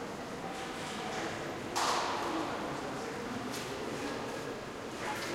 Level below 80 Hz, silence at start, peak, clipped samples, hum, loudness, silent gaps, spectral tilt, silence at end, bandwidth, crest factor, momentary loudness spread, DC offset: -62 dBFS; 0 s; -18 dBFS; under 0.1%; none; -37 LUFS; none; -3.5 dB/octave; 0 s; 16 kHz; 20 dB; 8 LU; under 0.1%